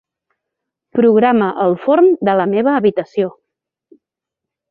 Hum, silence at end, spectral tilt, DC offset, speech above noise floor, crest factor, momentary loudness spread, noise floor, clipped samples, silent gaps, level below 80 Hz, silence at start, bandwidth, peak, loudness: none; 1.4 s; -9.5 dB/octave; under 0.1%; 70 dB; 14 dB; 9 LU; -83 dBFS; under 0.1%; none; -62 dBFS; 0.95 s; 5 kHz; -2 dBFS; -14 LUFS